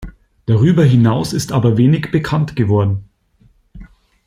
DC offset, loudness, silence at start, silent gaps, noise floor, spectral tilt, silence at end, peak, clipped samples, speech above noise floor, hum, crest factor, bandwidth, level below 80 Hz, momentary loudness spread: under 0.1%; -14 LUFS; 0 s; none; -53 dBFS; -7.5 dB/octave; 0.4 s; -2 dBFS; under 0.1%; 40 dB; none; 12 dB; 15 kHz; -42 dBFS; 8 LU